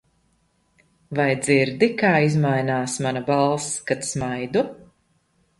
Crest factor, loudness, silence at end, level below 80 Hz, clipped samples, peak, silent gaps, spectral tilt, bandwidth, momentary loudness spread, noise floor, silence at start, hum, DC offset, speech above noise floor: 18 dB; -21 LUFS; 0.75 s; -58 dBFS; under 0.1%; -4 dBFS; none; -5 dB/octave; 11.5 kHz; 7 LU; -65 dBFS; 1.1 s; none; under 0.1%; 44 dB